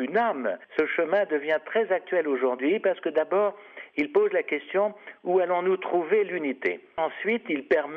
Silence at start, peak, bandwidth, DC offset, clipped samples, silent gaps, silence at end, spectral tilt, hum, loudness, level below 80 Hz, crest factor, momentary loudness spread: 0 s; -12 dBFS; 5.4 kHz; under 0.1%; under 0.1%; none; 0 s; -7 dB/octave; none; -26 LUFS; -74 dBFS; 14 dB; 6 LU